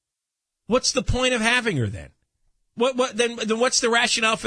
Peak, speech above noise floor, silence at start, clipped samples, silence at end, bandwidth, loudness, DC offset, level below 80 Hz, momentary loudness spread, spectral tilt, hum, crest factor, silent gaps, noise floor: -4 dBFS; 63 dB; 0.7 s; under 0.1%; 0 s; 10.5 kHz; -21 LUFS; under 0.1%; -42 dBFS; 7 LU; -3 dB/octave; none; 20 dB; none; -85 dBFS